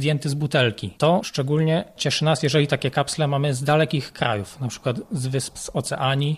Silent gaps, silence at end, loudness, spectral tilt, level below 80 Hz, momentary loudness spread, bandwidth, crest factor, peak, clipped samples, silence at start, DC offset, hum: none; 0 s; -22 LUFS; -5 dB/octave; -54 dBFS; 7 LU; 14 kHz; 18 dB; -4 dBFS; under 0.1%; 0 s; under 0.1%; none